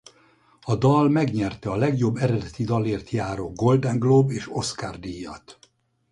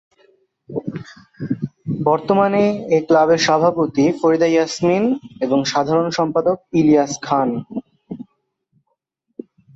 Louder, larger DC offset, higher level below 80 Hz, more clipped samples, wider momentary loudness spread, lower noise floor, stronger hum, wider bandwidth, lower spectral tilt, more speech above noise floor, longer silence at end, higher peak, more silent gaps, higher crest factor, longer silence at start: second, -23 LUFS vs -17 LUFS; neither; first, -50 dBFS vs -58 dBFS; neither; second, 16 LU vs 19 LU; second, -60 dBFS vs -72 dBFS; neither; first, 11 kHz vs 8 kHz; first, -7 dB/octave vs -5.5 dB/octave; second, 38 dB vs 55 dB; second, 0.6 s vs 1.55 s; second, -6 dBFS vs -2 dBFS; neither; about the same, 18 dB vs 16 dB; about the same, 0.65 s vs 0.7 s